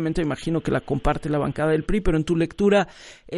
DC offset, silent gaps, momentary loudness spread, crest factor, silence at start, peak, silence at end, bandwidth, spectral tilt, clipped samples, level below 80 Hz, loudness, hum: under 0.1%; none; 5 LU; 16 dB; 0 s; -6 dBFS; 0 s; 11.5 kHz; -7 dB/octave; under 0.1%; -34 dBFS; -23 LUFS; none